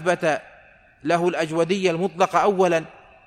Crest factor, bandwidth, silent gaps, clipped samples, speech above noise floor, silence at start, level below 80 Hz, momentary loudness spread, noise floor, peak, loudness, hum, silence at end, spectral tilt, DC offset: 18 dB; 13.5 kHz; none; under 0.1%; 31 dB; 0 s; -62 dBFS; 8 LU; -51 dBFS; -4 dBFS; -21 LUFS; none; 0.35 s; -5.5 dB/octave; under 0.1%